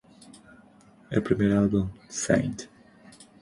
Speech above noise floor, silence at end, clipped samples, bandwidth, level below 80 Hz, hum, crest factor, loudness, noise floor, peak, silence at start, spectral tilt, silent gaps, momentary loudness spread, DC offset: 30 dB; 0.3 s; under 0.1%; 11.5 kHz; -50 dBFS; none; 20 dB; -26 LUFS; -55 dBFS; -8 dBFS; 1.1 s; -6 dB/octave; none; 13 LU; under 0.1%